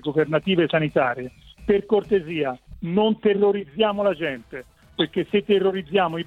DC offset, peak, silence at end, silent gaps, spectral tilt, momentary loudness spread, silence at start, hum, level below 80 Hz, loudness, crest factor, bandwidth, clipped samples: under 0.1%; -6 dBFS; 0.05 s; none; -7.5 dB/octave; 13 LU; 0.05 s; none; -52 dBFS; -22 LUFS; 16 dB; 4.7 kHz; under 0.1%